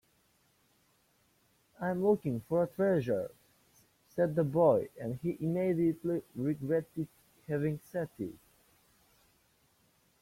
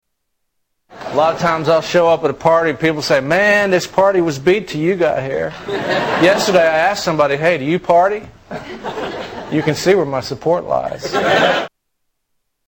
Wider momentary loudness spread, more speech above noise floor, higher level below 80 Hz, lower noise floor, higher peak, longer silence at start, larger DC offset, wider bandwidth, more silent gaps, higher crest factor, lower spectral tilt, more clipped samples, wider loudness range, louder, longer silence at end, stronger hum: about the same, 14 LU vs 12 LU; second, 40 dB vs 55 dB; second, -68 dBFS vs -50 dBFS; about the same, -71 dBFS vs -70 dBFS; second, -14 dBFS vs -2 dBFS; first, 1.8 s vs 0.9 s; neither; about the same, 16.5 kHz vs 17 kHz; neither; first, 20 dB vs 14 dB; first, -9 dB/octave vs -5 dB/octave; neither; first, 7 LU vs 4 LU; second, -33 LUFS vs -15 LUFS; first, 1.85 s vs 1 s; neither